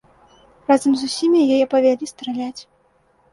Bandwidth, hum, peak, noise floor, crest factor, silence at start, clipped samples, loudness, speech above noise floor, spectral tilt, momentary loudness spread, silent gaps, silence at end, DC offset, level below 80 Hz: 11.5 kHz; none; -4 dBFS; -59 dBFS; 16 dB; 0.7 s; under 0.1%; -18 LUFS; 42 dB; -4 dB/octave; 14 LU; none; 0.7 s; under 0.1%; -62 dBFS